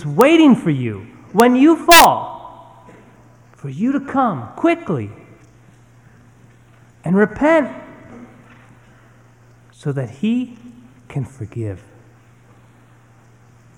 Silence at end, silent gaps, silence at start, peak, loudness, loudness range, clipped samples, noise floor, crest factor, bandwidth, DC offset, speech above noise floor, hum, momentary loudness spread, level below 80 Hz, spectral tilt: 2 s; none; 0 s; 0 dBFS; -15 LUFS; 13 LU; under 0.1%; -48 dBFS; 18 dB; 19.5 kHz; under 0.1%; 34 dB; none; 22 LU; -50 dBFS; -4.5 dB/octave